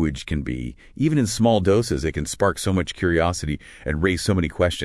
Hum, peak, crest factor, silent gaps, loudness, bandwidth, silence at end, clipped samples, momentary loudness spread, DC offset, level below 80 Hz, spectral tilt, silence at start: none; -6 dBFS; 16 dB; none; -22 LUFS; 12 kHz; 0 s; under 0.1%; 10 LU; under 0.1%; -38 dBFS; -5.5 dB/octave; 0 s